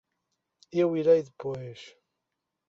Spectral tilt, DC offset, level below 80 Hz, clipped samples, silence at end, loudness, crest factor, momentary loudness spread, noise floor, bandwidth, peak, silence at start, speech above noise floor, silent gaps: -7.5 dB/octave; under 0.1%; -72 dBFS; under 0.1%; 0.8 s; -27 LUFS; 18 dB; 19 LU; -84 dBFS; 7.4 kHz; -10 dBFS; 0.75 s; 58 dB; none